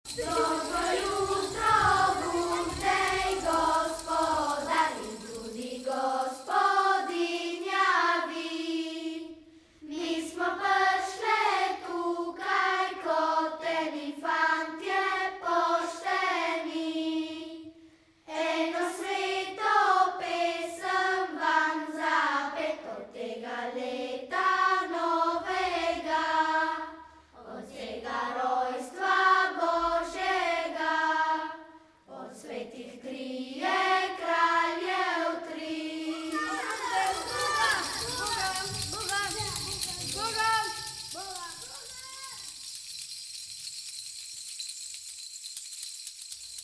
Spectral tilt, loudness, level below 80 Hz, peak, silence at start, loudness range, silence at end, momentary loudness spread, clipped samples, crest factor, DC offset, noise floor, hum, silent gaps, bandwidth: -2.5 dB/octave; -29 LUFS; -58 dBFS; -12 dBFS; 0.05 s; 5 LU; 0 s; 14 LU; under 0.1%; 18 dB; under 0.1%; -58 dBFS; none; none; 11 kHz